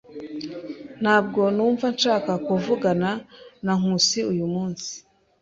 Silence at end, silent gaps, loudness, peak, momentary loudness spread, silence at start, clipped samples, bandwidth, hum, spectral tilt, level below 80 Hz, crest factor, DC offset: 0.45 s; none; -22 LUFS; -4 dBFS; 15 LU; 0.1 s; under 0.1%; 7.8 kHz; none; -4.5 dB/octave; -62 dBFS; 20 dB; under 0.1%